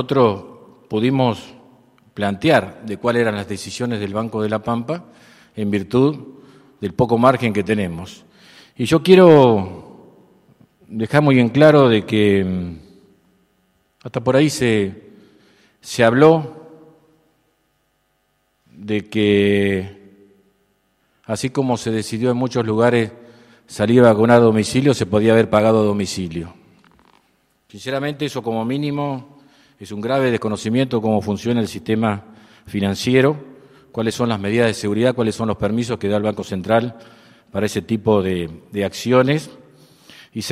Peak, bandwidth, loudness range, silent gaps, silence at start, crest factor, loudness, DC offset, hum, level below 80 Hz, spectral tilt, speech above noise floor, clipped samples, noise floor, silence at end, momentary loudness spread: 0 dBFS; 14.5 kHz; 7 LU; none; 0 s; 18 dB; -18 LUFS; under 0.1%; none; -54 dBFS; -6.5 dB/octave; 49 dB; under 0.1%; -66 dBFS; 0 s; 17 LU